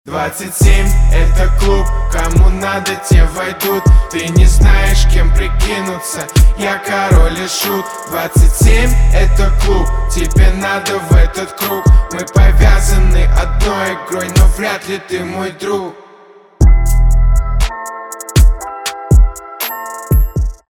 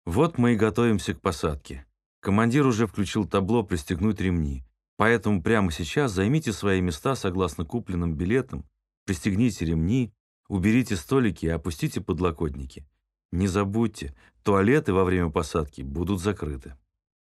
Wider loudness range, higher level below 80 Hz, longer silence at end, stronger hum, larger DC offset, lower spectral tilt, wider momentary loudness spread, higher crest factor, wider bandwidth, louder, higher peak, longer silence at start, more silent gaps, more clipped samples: about the same, 4 LU vs 3 LU; first, -12 dBFS vs -42 dBFS; second, 0.15 s vs 0.6 s; neither; neither; second, -5 dB/octave vs -6.5 dB/octave; second, 9 LU vs 12 LU; second, 10 dB vs 20 dB; first, 16 kHz vs 13 kHz; first, -13 LUFS vs -25 LUFS; first, 0 dBFS vs -4 dBFS; about the same, 0.05 s vs 0.05 s; second, none vs 2.06-2.22 s, 4.88-4.97 s, 8.97-9.06 s, 10.20-10.43 s, 13.25-13.29 s; neither